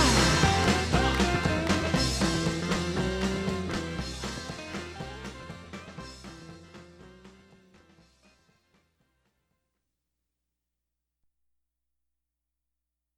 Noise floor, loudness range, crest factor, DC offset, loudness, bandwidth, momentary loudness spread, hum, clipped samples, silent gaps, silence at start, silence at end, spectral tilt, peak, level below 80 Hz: -86 dBFS; 22 LU; 24 dB; under 0.1%; -27 LUFS; 15.5 kHz; 21 LU; none; under 0.1%; none; 0 s; 5.85 s; -4.5 dB/octave; -8 dBFS; -40 dBFS